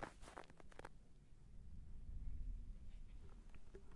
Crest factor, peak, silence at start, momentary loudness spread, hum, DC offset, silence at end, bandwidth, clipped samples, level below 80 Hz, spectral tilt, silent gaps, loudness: 18 dB; -34 dBFS; 0 s; 10 LU; none; under 0.1%; 0 s; 11.5 kHz; under 0.1%; -54 dBFS; -6 dB/octave; none; -59 LUFS